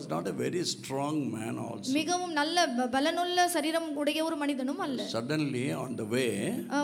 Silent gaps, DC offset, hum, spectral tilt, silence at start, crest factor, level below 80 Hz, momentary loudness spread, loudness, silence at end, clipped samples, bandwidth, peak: none; under 0.1%; none; -4 dB/octave; 0 s; 18 dB; -74 dBFS; 7 LU; -30 LUFS; 0 s; under 0.1%; 16.5 kHz; -14 dBFS